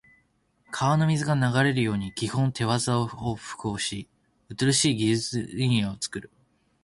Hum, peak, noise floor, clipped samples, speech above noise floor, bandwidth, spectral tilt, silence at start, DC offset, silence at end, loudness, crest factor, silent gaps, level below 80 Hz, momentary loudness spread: none; -10 dBFS; -67 dBFS; under 0.1%; 42 dB; 11.5 kHz; -4.5 dB/octave; 0.7 s; under 0.1%; 0.6 s; -25 LUFS; 18 dB; none; -56 dBFS; 11 LU